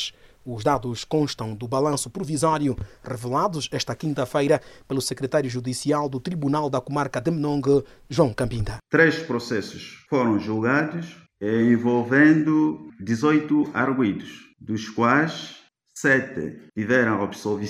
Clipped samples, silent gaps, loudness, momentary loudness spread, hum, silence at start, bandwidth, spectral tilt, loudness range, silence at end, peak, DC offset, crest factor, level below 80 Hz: under 0.1%; none; -23 LUFS; 13 LU; none; 0 s; 14.5 kHz; -5.5 dB/octave; 4 LU; 0 s; -4 dBFS; under 0.1%; 20 dB; -50 dBFS